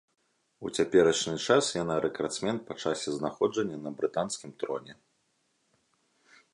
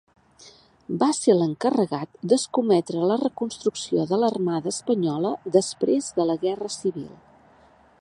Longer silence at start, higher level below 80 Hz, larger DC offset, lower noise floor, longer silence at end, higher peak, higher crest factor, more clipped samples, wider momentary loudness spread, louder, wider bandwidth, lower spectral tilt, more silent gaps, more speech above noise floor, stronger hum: first, 0.6 s vs 0.45 s; about the same, -66 dBFS vs -66 dBFS; neither; first, -74 dBFS vs -55 dBFS; first, 1.6 s vs 0.9 s; second, -10 dBFS vs -4 dBFS; about the same, 22 dB vs 20 dB; neither; first, 12 LU vs 7 LU; second, -29 LUFS vs -24 LUFS; about the same, 11.5 kHz vs 11.5 kHz; second, -4 dB/octave vs -5.5 dB/octave; neither; first, 45 dB vs 32 dB; neither